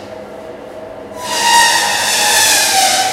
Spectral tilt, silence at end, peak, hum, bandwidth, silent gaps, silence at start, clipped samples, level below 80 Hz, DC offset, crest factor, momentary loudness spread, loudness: 1 dB/octave; 0 s; 0 dBFS; none; 17.5 kHz; none; 0 s; under 0.1%; -52 dBFS; under 0.1%; 14 dB; 22 LU; -10 LUFS